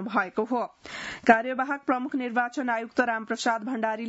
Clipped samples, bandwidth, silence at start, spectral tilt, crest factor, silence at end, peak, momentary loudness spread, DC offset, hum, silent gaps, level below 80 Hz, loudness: under 0.1%; 8 kHz; 0 s; -4 dB/octave; 24 dB; 0 s; -4 dBFS; 8 LU; under 0.1%; none; none; -68 dBFS; -27 LUFS